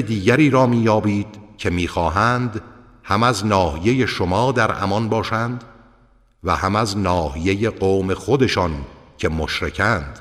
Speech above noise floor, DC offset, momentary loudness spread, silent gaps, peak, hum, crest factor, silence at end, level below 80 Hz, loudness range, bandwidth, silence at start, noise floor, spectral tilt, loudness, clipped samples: 36 dB; under 0.1%; 10 LU; none; -4 dBFS; none; 16 dB; 0 s; -38 dBFS; 2 LU; 14.5 kHz; 0 s; -54 dBFS; -6 dB/octave; -19 LUFS; under 0.1%